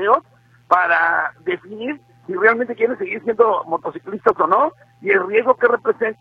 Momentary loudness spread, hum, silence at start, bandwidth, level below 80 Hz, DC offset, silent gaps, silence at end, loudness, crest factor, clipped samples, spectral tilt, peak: 13 LU; none; 0 s; 5.4 kHz; -64 dBFS; under 0.1%; none; 0.05 s; -18 LUFS; 18 dB; under 0.1%; -6.5 dB/octave; 0 dBFS